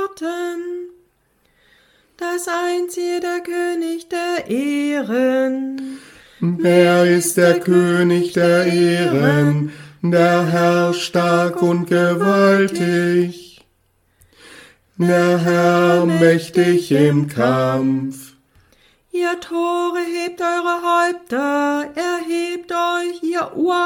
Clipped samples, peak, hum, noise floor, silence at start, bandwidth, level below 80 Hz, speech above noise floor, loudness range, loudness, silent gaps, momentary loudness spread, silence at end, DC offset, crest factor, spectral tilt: under 0.1%; 0 dBFS; none; -62 dBFS; 0 s; 17 kHz; -62 dBFS; 45 dB; 7 LU; -17 LUFS; none; 10 LU; 0 s; under 0.1%; 16 dB; -6 dB/octave